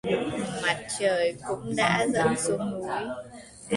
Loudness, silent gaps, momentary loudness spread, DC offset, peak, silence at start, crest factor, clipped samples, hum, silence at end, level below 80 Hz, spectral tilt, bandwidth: -27 LUFS; none; 12 LU; under 0.1%; -8 dBFS; 0.05 s; 18 dB; under 0.1%; none; 0 s; -58 dBFS; -4 dB/octave; 11.5 kHz